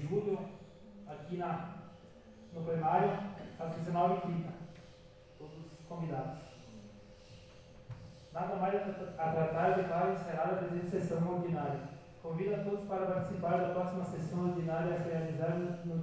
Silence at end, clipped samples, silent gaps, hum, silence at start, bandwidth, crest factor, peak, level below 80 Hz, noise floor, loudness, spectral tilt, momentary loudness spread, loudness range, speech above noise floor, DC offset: 0 s; under 0.1%; none; none; 0 s; 8 kHz; 20 dB; -16 dBFS; -66 dBFS; -57 dBFS; -36 LUFS; -8.5 dB/octave; 22 LU; 10 LU; 22 dB; under 0.1%